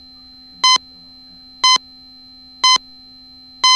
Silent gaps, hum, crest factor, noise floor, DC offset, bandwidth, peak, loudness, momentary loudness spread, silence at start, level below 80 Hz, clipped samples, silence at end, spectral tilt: none; none; 18 dB; -42 dBFS; under 0.1%; 13 kHz; -2 dBFS; -14 LUFS; 3 LU; 0.65 s; -58 dBFS; under 0.1%; 0 s; 3 dB/octave